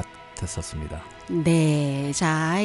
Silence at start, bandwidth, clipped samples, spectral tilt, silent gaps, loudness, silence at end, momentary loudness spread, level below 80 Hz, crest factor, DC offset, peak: 0 s; 11.5 kHz; under 0.1%; -5.5 dB/octave; none; -24 LUFS; 0 s; 15 LU; -44 dBFS; 14 dB; under 0.1%; -10 dBFS